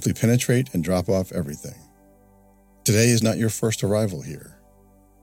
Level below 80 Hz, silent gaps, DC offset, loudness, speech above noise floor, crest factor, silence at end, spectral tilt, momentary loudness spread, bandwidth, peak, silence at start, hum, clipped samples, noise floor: -52 dBFS; none; under 0.1%; -22 LUFS; 33 dB; 16 dB; 0.75 s; -5 dB/octave; 17 LU; 17 kHz; -6 dBFS; 0 s; 50 Hz at -50 dBFS; under 0.1%; -55 dBFS